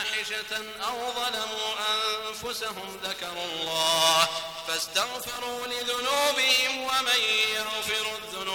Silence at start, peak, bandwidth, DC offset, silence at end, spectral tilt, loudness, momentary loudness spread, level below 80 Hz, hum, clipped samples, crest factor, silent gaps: 0 s; -8 dBFS; 19 kHz; under 0.1%; 0 s; 0 dB/octave; -26 LUFS; 11 LU; -64 dBFS; none; under 0.1%; 20 dB; none